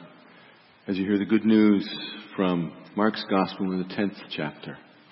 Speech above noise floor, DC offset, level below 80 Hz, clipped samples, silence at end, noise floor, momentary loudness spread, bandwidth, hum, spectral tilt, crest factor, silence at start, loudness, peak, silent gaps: 29 dB; under 0.1%; -68 dBFS; under 0.1%; 0.3 s; -54 dBFS; 15 LU; 5.8 kHz; none; -10.5 dB/octave; 18 dB; 0 s; -26 LUFS; -8 dBFS; none